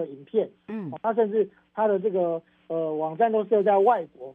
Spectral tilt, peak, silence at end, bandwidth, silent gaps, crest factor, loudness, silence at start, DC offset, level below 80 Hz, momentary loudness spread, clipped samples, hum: -9.5 dB/octave; -6 dBFS; 0 s; 3.8 kHz; none; 18 dB; -25 LUFS; 0 s; under 0.1%; -78 dBFS; 12 LU; under 0.1%; none